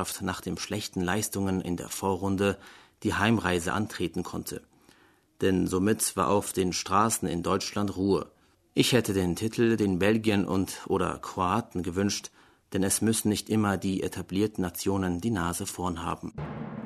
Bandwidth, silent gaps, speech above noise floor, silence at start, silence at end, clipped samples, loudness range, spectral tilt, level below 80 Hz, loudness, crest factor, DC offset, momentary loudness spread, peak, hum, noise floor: 13.5 kHz; none; 34 dB; 0 s; 0 s; under 0.1%; 3 LU; -4.5 dB/octave; -54 dBFS; -28 LUFS; 20 dB; under 0.1%; 9 LU; -8 dBFS; none; -62 dBFS